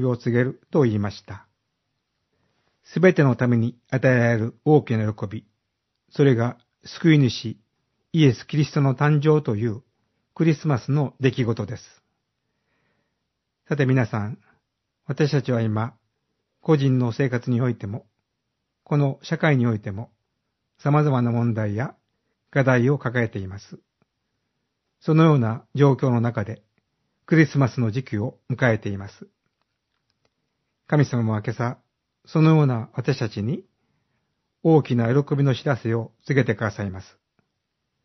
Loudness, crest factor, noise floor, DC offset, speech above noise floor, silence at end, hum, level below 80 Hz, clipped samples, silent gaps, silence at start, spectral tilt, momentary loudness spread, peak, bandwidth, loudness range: -22 LUFS; 22 dB; -78 dBFS; under 0.1%; 57 dB; 1 s; none; -64 dBFS; under 0.1%; none; 0 s; -8 dB/octave; 15 LU; -2 dBFS; 6.2 kHz; 5 LU